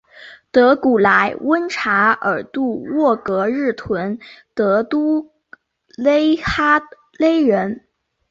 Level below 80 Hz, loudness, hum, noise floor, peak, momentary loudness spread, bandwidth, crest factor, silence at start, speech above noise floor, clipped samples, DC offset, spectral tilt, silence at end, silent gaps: -48 dBFS; -17 LUFS; none; -48 dBFS; -2 dBFS; 9 LU; 7.6 kHz; 16 dB; 0.2 s; 31 dB; under 0.1%; under 0.1%; -6 dB/octave; 0.5 s; none